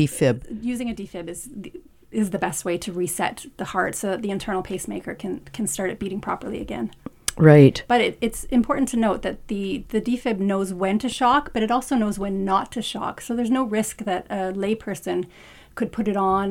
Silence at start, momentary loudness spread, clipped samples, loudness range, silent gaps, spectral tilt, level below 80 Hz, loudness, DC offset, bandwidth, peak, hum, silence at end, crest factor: 0 s; 11 LU; under 0.1%; 8 LU; none; -5.5 dB/octave; -46 dBFS; -23 LUFS; under 0.1%; 16.5 kHz; 0 dBFS; none; 0 s; 22 dB